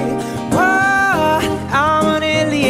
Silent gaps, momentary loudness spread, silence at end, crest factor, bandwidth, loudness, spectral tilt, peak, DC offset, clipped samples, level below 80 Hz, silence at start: none; 6 LU; 0 s; 12 dB; 16 kHz; -15 LUFS; -4.5 dB/octave; -2 dBFS; under 0.1%; under 0.1%; -42 dBFS; 0 s